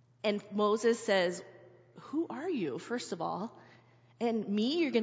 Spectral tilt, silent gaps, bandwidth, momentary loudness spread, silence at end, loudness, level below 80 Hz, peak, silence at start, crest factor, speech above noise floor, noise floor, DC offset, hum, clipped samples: -5 dB/octave; none; 8 kHz; 10 LU; 0 s; -33 LUFS; -82 dBFS; -16 dBFS; 0.25 s; 18 dB; 29 dB; -61 dBFS; under 0.1%; none; under 0.1%